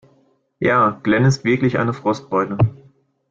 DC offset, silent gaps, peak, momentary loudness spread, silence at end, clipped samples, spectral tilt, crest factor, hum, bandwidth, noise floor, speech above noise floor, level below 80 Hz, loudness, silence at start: under 0.1%; none; -4 dBFS; 5 LU; 0.55 s; under 0.1%; -7 dB/octave; 16 dB; none; 7.8 kHz; -59 dBFS; 42 dB; -48 dBFS; -18 LUFS; 0.6 s